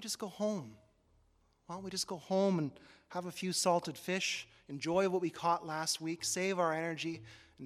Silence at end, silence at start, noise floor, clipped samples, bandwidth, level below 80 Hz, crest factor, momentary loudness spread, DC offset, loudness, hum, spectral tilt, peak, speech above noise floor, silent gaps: 0 s; 0 s; -71 dBFS; under 0.1%; 16 kHz; -74 dBFS; 18 dB; 11 LU; under 0.1%; -35 LUFS; none; -3.5 dB/octave; -18 dBFS; 35 dB; none